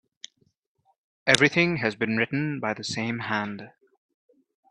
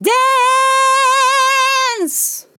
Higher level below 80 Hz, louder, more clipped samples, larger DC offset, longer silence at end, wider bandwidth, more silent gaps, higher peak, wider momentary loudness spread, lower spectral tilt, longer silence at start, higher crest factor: first, -64 dBFS vs -90 dBFS; second, -24 LUFS vs -12 LUFS; neither; neither; first, 1.05 s vs 0.2 s; second, 11.5 kHz vs 19 kHz; neither; first, 0 dBFS vs -4 dBFS; first, 22 LU vs 5 LU; first, -4 dB/octave vs 0 dB/octave; first, 1.25 s vs 0 s; first, 28 dB vs 10 dB